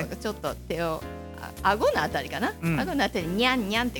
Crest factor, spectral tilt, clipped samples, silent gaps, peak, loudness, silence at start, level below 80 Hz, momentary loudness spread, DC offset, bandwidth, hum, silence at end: 20 dB; -5 dB/octave; under 0.1%; none; -8 dBFS; -27 LUFS; 0 s; -44 dBFS; 11 LU; under 0.1%; 17.5 kHz; none; 0 s